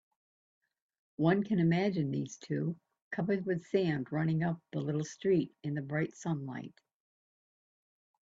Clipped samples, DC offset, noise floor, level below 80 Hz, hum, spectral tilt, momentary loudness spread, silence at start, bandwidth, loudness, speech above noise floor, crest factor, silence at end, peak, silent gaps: under 0.1%; under 0.1%; under -90 dBFS; -72 dBFS; none; -7.5 dB/octave; 10 LU; 1.2 s; 7.8 kHz; -33 LUFS; over 57 dB; 20 dB; 1.55 s; -16 dBFS; 3.02-3.11 s